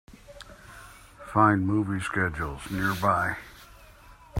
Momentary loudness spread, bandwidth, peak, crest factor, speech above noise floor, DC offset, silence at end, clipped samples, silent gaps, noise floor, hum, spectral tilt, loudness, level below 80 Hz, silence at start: 25 LU; 16 kHz; -6 dBFS; 22 dB; 26 dB; under 0.1%; 0 s; under 0.1%; none; -51 dBFS; none; -6.5 dB/octave; -26 LUFS; -50 dBFS; 0.3 s